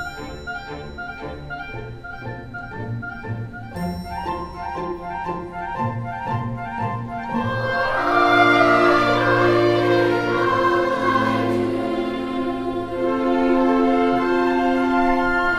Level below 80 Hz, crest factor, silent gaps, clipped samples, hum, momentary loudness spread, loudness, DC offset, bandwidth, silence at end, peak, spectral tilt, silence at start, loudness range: -42 dBFS; 18 dB; none; under 0.1%; none; 16 LU; -20 LUFS; under 0.1%; 13.5 kHz; 0 s; -2 dBFS; -6.5 dB/octave; 0 s; 14 LU